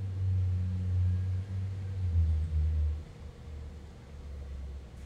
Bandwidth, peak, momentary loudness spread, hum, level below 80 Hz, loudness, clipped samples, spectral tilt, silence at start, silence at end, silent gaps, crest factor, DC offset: 5 kHz; -20 dBFS; 17 LU; none; -38 dBFS; -33 LUFS; under 0.1%; -8.5 dB/octave; 0 s; 0 s; none; 12 dB; under 0.1%